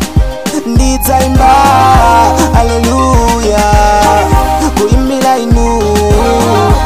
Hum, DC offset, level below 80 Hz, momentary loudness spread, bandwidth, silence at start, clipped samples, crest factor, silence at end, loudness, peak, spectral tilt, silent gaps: none; 3%; -14 dBFS; 5 LU; 16.5 kHz; 0 s; 0.6%; 8 dB; 0 s; -8 LUFS; 0 dBFS; -5.5 dB/octave; none